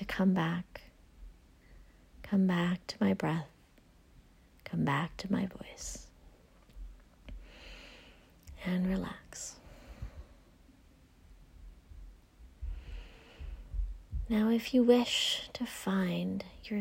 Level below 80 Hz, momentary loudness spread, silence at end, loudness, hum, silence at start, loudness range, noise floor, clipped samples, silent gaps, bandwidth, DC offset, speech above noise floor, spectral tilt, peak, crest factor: -50 dBFS; 25 LU; 0 s; -33 LUFS; none; 0 s; 19 LU; -62 dBFS; under 0.1%; none; 16 kHz; under 0.1%; 30 dB; -5.5 dB/octave; -12 dBFS; 22 dB